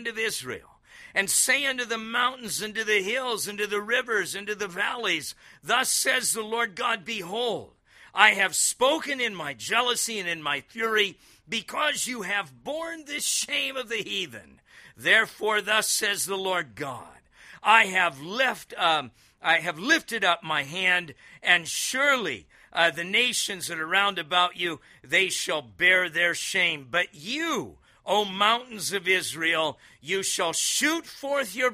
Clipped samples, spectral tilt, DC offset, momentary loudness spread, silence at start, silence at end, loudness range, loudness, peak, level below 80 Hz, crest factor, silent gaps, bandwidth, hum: under 0.1%; -1 dB/octave; under 0.1%; 11 LU; 0 s; 0 s; 3 LU; -25 LUFS; -2 dBFS; -68 dBFS; 26 dB; none; 15.5 kHz; none